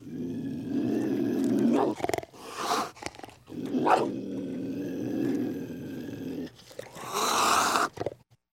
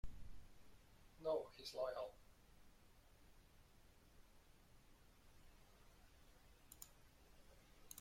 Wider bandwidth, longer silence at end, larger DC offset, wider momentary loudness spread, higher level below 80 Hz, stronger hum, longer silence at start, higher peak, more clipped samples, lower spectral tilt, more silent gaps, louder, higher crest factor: about the same, 16.5 kHz vs 16.5 kHz; first, 0.45 s vs 0 s; neither; second, 16 LU vs 24 LU; about the same, -64 dBFS vs -66 dBFS; neither; about the same, 0 s vs 0.05 s; first, -8 dBFS vs -32 dBFS; neither; about the same, -4 dB/octave vs -4 dB/octave; neither; first, -29 LUFS vs -49 LUFS; about the same, 22 dB vs 22 dB